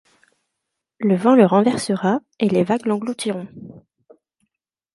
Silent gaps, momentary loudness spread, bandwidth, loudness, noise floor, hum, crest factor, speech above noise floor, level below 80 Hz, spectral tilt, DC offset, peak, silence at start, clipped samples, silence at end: none; 12 LU; 11.5 kHz; -18 LUFS; -80 dBFS; none; 20 dB; 62 dB; -64 dBFS; -6.5 dB/octave; under 0.1%; -2 dBFS; 1 s; under 0.1%; 1.15 s